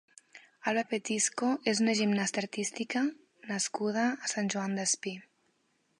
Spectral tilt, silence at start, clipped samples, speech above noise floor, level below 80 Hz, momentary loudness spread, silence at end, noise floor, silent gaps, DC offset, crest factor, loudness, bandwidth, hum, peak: -3 dB/octave; 0.35 s; under 0.1%; 43 dB; -82 dBFS; 7 LU; 0.8 s; -74 dBFS; none; under 0.1%; 20 dB; -31 LUFS; 11.5 kHz; none; -14 dBFS